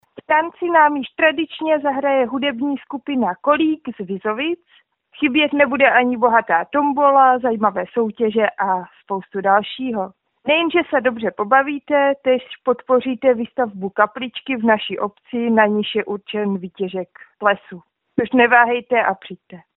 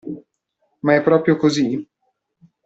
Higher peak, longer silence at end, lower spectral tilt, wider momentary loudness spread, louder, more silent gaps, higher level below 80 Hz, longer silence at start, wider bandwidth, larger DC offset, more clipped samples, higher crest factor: about the same, 0 dBFS vs -2 dBFS; second, 0.15 s vs 0.8 s; second, -2.5 dB/octave vs -6 dB/octave; second, 12 LU vs 17 LU; about the same, -18 LUFS vs -18 LUFS; neither; about the same, -62 dBFS vs -62 dBFS; about the same, 0.15 s vs 0.05 s; second, 4.1 kHz vs 8 kHz; neither; neither; about the same, 18 dB vs 18 dB